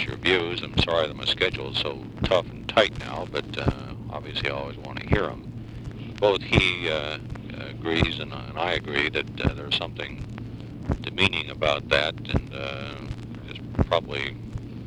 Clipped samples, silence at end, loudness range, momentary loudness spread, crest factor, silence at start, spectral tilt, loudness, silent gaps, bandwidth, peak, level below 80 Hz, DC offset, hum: under 0.1%; 0 s; 3 LU; 14 LU; 26 dB; 0 s; -5.5 dB/octave; -26 LUFS; none; 11.5 kHz; -2 dBFS; -40 dBFS; under 0.1%; none